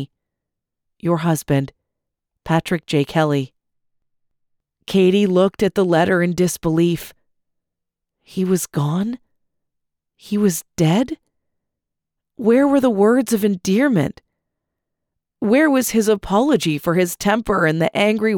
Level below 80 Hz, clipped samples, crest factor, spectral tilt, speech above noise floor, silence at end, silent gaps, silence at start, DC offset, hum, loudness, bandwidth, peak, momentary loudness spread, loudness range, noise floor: -50 dBFS; under 0.1%; 14 dB; -6 dB/octave; 64 dB; 0 s; none; 0 s; under 0.1%; none; -18 LUFS; over 20 kHz; -4 dBFS; 11 LU; 6 LU; -81 dBFS